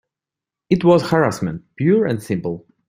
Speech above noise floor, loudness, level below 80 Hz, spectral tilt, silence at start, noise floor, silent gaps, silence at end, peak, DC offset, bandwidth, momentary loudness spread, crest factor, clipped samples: 70 dB; -18 LUFS; -52 dBFS; -7 dB/octave; 0.7 s; -87 dBFS; none; 0.3 s; -2 dBFS; under 0.1%; 16 kHz; 11 LU; 16 dB; under 0.1%